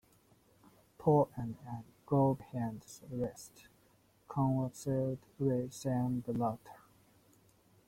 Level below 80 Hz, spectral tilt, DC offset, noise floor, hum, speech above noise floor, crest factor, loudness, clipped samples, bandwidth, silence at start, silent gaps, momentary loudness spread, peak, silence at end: -66 dBFS; -8 dB/octave; under 0.1%; -69 dBFS; none; 34 dB; 18 dB; -35 LUFS; under 0.1%; 16.5 kHz; 1 s; none; 16 LU; -18 dBFS; 1.1 s